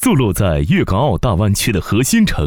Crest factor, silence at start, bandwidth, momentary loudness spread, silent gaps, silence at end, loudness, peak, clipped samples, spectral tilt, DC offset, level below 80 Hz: 10 dB; 0 s; 19.5 kHz; 2 LU; none; 0 s; -15 LUFS; -4 dBFS; under 0.1%; -5.5 dB/octave; 0.5%; -26 dBFS